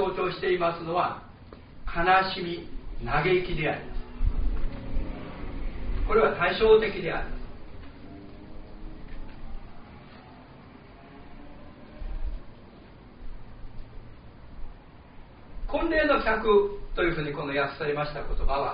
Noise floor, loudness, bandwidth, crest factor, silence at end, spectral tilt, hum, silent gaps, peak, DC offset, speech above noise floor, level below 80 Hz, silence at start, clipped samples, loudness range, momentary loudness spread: -49 dBFS; -27 LUFS; 5.2 kHz; 20 dB; 0 s; -3.5 dB/octave; none; none; -8 dBFS; 0.1%; 24 dB; -36 dBFS; 0 s; under 0.1%; 20 LU; 26 LU